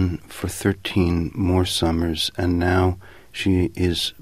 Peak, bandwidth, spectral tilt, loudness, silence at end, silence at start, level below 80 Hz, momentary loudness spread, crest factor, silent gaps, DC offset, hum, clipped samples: -6 dBFS; 15.5 kHz; -5.5 dB/octave; -22 LUFS; 0.1 s; 0 s; -38 dBFS; 7 LU; 16 dB; none; 0.4%; none; under 0.1%